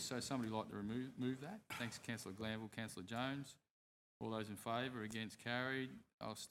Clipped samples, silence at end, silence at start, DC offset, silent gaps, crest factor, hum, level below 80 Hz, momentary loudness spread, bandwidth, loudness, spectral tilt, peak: under 0.1%; 0 s; 0 s; under 0.1%; 3.70-4.20 s, 6.13-6.18 s; 20 dB; none; -78 dBFS; 7 LU; 16.5 kHz; -46 LUFS; -4.5 dB/octave; -26 dBFS